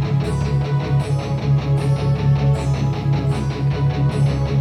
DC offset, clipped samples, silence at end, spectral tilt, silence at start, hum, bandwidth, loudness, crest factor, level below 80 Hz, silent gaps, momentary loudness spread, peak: under 0.1%; under 0.1%; 0 s; -8 dB/octave; 0 s; none; 10 kHz; -19 LUFS; 10 dB; -32 dBFS; none; 3 LU; -8 dBFS